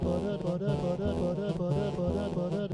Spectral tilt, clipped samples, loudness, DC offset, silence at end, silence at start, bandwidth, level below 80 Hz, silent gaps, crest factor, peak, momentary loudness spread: -8.5 dB/octave; under 0.1%; -31 LUFS; under 0.1%; 0 s; 0 s; 11 kHz; -48 dBFS; none; 12 dB; -18 dBFS; 1 LU